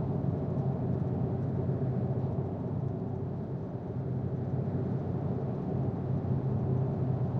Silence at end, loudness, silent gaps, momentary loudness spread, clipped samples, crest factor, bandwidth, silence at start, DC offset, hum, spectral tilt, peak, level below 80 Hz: 0 s; -33 LUFS; none; 5 LU; under 0.1%; 12 dB; 3.8 kHz; 0 s; under 0.1%; none; -12 dB/octave; -20 dBFS; -52 dBFS